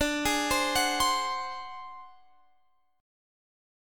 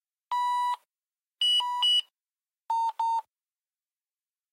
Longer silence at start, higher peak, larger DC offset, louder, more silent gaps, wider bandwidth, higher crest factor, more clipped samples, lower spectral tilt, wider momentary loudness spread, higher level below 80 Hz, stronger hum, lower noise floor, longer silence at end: second, 0 s vs 0.3 s; first, -14 dBFS vs -18 dBFS; neither; about the same, -27 LUFS vs -26 LUFS; neither; first, 17.5 kHz vs 15.5 kHz; first, 18 dB vs 12 dB; neither; first, -1.5 dB/octave vs 7.5 dB/octave; first, 19 LU vs 10 LU; first, -52 dBFS vs under -90 dBFS; neither; second, -71 dBFS vs under -90 dBFS; second, 1 s vs 1.3 s